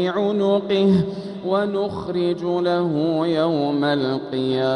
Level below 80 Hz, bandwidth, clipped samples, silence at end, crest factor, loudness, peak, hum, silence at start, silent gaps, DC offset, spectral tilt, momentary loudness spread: -58 dBFS; 10 kHz; under 0.1%; 0 s; 12 dB; -21 LUFS; -8 dBFS; none; 0 s; none; under 0.1%; -8 dB/octave; 5 LU